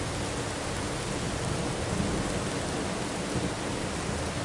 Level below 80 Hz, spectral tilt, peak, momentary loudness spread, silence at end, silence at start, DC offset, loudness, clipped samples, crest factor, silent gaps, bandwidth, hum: -44 dBFS; -4.5 dB/octave; -16 dBFS; 2 LU; 0 s; 0 s; under 0.1%; -31 LUFS; under 0.1%; 14 dB; none; 11.5 kHz; none